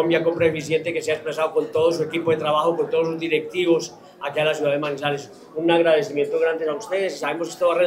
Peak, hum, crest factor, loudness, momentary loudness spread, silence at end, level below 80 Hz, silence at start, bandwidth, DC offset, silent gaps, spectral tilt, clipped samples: -6 dBFS; none; 16 dB; -22 LUFS; 7 LU; 0 s; -66 dBFS; 0 s; 15 kHz; under 0.1%; none; -5 dB/octave; under 0.1%